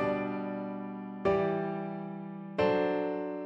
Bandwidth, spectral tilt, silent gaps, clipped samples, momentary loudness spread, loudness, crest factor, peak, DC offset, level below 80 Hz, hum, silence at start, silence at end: 7.6 kHz; -8.5 dB/octave; none; under 0.1%; 11 LU; -33 LUFS; 16 dB; -16 dBFS; under 0.1%; -62 dBFS; none; 0 s; 0 s